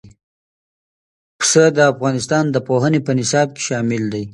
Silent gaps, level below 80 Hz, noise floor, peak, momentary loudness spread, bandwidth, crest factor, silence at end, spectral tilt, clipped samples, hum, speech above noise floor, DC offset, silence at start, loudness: 0.23-1.39 s; -58 dBFS; under -90 dBFS; 0 dBFS; 8 LU; 11.5 kHz; 18 dB; 0 s; -4.5 dB/octave; under 0.1%; none; over 74 dB; under 0.1%; 0.05 s; -16 LUFS